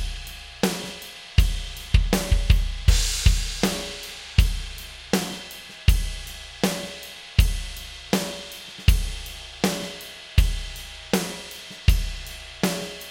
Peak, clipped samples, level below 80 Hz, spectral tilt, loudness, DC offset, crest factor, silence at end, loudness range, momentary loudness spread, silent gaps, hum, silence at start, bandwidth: -2 dBFS; under 0.1%; -26 dBFS; -4.5 dB/octave; -26 LUFS; under 0.1%; 22 dB; 0 s; 4 LU; 14 LU; none; none; 0 s; 17 kHz